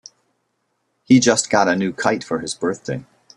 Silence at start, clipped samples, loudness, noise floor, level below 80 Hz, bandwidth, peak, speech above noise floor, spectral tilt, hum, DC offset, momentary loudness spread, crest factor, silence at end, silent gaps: 1.1 s; under 0.1%; -18 LUFS; -71 dBFS; -58 dBFS; 11.5 kHz; -2 dBFS; 53 dB; -4 dB/octave; none; under 0.1%; 14 LU; 18 dB; 0.35 s; none